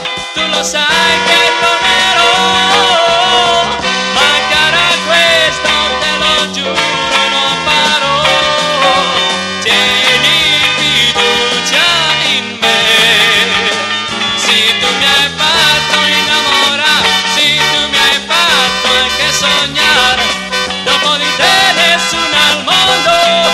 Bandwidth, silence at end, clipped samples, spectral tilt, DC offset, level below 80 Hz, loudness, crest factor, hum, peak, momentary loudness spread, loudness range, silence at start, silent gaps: 16.5 kHz; 0 s; under 0.1%; -1 dB/octave; under 0.1%; -40 dBFS; -8 LUFS; 10 dB; none; 0 dBFS; 5 LU; 1 LU; 0 s; none